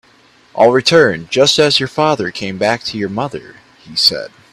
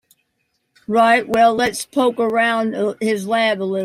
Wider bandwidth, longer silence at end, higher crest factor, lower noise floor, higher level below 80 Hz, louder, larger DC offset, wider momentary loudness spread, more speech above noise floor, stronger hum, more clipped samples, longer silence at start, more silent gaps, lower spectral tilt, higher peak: about the same, 15.5 kHz vs 15.5 kHz; first, 0.25 s vs 0 s; about the same, 14 dB vs 16 dB; second, -49 dBFS vs -70 dBFS; first, -54 dBFS vs -60 dBFS; first, -13 LUFS vs -17 LUFS; neither; first, 13 LU vs 7 LU; second, 35 dB vs 53 dB; neither; neither; second, 0.55 s vs 0.9 s; neither; about the same, -3.5 dB/octave vs -4 dB/octave; about the same, 0 dBFS vs -2 dBFS